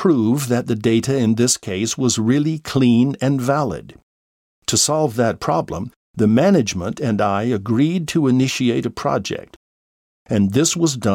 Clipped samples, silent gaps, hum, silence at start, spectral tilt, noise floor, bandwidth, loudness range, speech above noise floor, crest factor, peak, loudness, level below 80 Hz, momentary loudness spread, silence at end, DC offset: under 0.1%; 4.03-4.62 s, 5.96-6.14 s, 9.56-10.26 s; none; 0 s; -5 dB/octave; under -90 dBFS; 17 kHz; 2 LU; over 72 dB; 16 dB; -2 dBFS; -18 LUFS; -52 dBFS; 8 LU; 0 s; under 0.1%